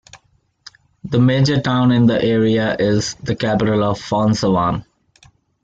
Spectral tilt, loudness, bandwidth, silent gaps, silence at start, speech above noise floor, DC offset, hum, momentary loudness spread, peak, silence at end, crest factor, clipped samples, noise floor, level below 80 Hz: -6.5 dB/octave; -17 LUFS; 8 kHz; none; 0.15 s; 43 dB; under 0.1%; none; 7 LU; -4 dBFS; 0.8 s; 14 dB; under 0.1%; -59 dBFS; -46 dBFS